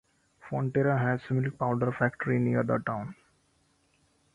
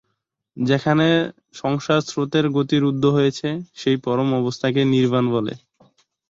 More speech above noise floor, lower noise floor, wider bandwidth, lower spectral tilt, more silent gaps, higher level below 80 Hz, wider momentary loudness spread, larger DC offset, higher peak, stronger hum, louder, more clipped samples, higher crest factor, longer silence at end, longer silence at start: second, 41 dB vs 56 dB; second, -69 dBFS vs -75 dBFS; about the same, 7.4 kHz vs 7.8 kHz; first, -9.5 dB/octave vs -6.5 dB/octave; neither; about the same, -62 dBFS vs -58 dBFS; about the same, 9 LU vs 9 LU; neither; second, -12 dBFS vs -4 dBFS; neither; second, -29 LUFS vs -20 LUFS; neither; about the same, 18 dB vs 16 dB; first, 1.2 s vs 0.7 s; about the same, 0.45 s vs 0.55 s